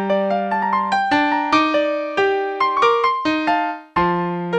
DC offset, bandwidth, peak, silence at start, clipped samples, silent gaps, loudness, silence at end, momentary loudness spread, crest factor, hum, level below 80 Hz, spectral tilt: under 0.1%; 9.2 kHz; -2 dBFS; 0 s; under 0.1%; none; -18 LUFS; 0 s; 5 LU; 16 dB; none; -52 dBFS; -5.5 dB/octave